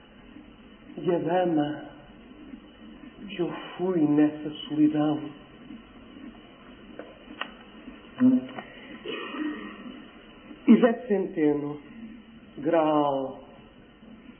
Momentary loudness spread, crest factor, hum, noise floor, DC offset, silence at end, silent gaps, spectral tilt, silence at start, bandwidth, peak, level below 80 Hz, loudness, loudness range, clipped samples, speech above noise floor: 24 LU; 22 dB; none; -51 dBFS; under 0.1%; 0.1 s; none; -10.5 dB/octave; 0.25 s; 3.5 kHz; -6 dBFS; -62 dBFS; -26 LUFS; 6 LU; under 0.1%; 26 dB